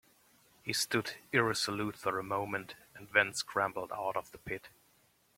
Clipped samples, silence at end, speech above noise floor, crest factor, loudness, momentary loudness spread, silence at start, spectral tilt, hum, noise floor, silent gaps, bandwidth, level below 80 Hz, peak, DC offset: under 0.1%; 0.7 s; 35 dB; 26 dB; -34 LUFS; 13 LU; 0.65 s; -3 dB/octave; none; -70 dBFS; none; 16.5 kHz; -70 dBFS; -10 dBFS; under 0.1%